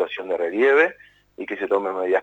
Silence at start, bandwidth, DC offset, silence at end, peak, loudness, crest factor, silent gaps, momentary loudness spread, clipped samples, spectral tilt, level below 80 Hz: 0 s; 7.8 kHz; under 0.1%; 0 s; -4 dBFS; -21 LUFS; 16 dB; none; 13 LU; under 0.1%; -5 dB/octave; -68 dBFS